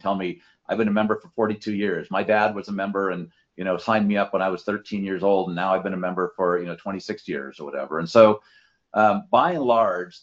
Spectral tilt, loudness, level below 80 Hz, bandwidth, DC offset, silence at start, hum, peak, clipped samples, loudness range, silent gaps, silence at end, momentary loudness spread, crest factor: -7 dB/octave; -23 LUFS; -64 dBFS; 7.6 kHz; under 0.1%; 0.05 s; none; 0 dBFS; under 0.1%; 4 LU; none; 0.05 s; 12 LU; 22 dB